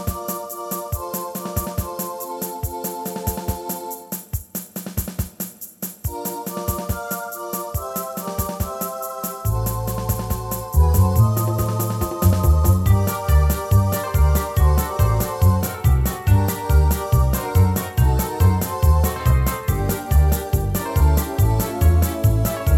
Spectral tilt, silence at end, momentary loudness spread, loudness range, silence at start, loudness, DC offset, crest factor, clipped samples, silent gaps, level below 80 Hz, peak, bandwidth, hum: -6 dB/octave; 0 s; 10 LU; 9 LU; 0 s; -21 LUFS; under 0.1%; 16 dB; under 0.1%; none; -24 dBFS; -4 dBFS; 18 kHz; none